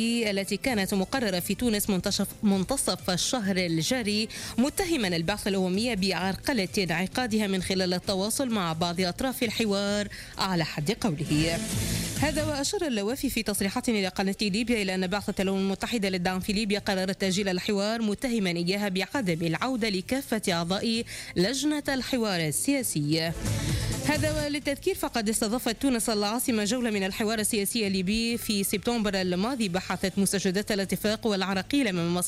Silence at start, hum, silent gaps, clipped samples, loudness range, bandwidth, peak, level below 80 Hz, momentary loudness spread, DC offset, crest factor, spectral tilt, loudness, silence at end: 0 s; none; none; under 0.1%; 1 LU; 16 kHz; -14 dBFS; -48 dBFS; 3 LU; under 0.1%; 12 dB; -4 dB/octave; -27 LUFS; 0 s